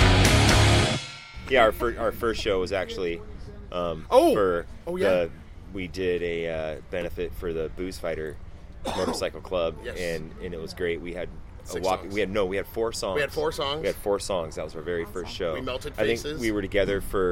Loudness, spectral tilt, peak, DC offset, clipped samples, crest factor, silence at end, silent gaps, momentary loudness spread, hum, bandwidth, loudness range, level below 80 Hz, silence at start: -26 LUFS; -5 dB/octave; -4 dBFS; under 0.1%; under 0.1%; 22 dB; 0 s; none; 16 LU; none; 16.5 kHz; 7 LU; -36 dBFS; 0 s